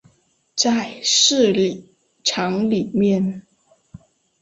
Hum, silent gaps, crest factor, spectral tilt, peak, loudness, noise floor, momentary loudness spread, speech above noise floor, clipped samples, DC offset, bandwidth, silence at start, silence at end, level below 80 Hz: none; none; 18 dB; -3.5 dB/octave; -2 dBFS; -18 LUFS; -61 dBFS; 12 LU; 43 dB; under 0.1%; under 0.1%; 8 kHz; 0.55 s; 1 s; -60 dBFS